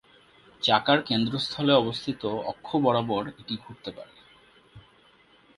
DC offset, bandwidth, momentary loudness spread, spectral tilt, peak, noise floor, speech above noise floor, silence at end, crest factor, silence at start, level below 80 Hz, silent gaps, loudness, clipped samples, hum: under 0.1%; 11.5 kHz; 15 LU; -6 dB/octave; -6 dBFS; -59 dBFS; 33 dB; 0.75 s; 22 dB; 0.6 s; -62 dBFS; none; -26 LUFS; under 0.1%; none